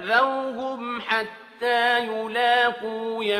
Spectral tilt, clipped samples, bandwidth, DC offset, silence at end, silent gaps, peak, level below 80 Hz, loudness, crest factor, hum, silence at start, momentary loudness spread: -3 dB/octave; under 0.1%; 14 kHz; under 0.1%; 0 s; none; -8 dBFS; -72 dBFS; -23 LUFS; 16 dB; none; 0 s; 10 LU